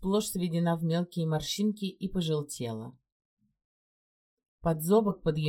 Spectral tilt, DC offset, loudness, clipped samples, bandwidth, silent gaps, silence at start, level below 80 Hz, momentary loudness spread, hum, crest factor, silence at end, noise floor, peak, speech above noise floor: -6 dB/octave; under 0.1%; -30 LUFS; under 0.1%; 17 kHz; 3.12-3.37 s, 3.65-4.37 s, 4.48-4.58 s; 0 s; -54 dBFS; 11 LU; none; 18 dB; 0 s; under -90 dBFS; -14 dBFS; over 61 dB